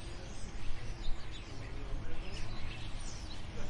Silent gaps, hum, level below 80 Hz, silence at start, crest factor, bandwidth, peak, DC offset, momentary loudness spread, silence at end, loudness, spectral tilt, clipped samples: none; none; -40 dBFS; 0 s; 14 dB; 9.8 kHz; -20 dBFS; under 0.1%; 3 LU; 0 s; -46 LUFS; -4.5 dB/octave; under 0.1%